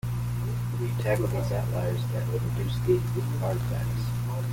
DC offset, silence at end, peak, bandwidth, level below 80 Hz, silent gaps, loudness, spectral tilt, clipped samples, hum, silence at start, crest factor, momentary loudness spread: under 0.1%; 0 s; -10 dBFS; 17 kHz; -42 dBFS; none; -28 LUFS; -7 dB/octave; under 0.1%; 60 Hz at -30 dBFS; 0.05 s; 16 dB; 5 LU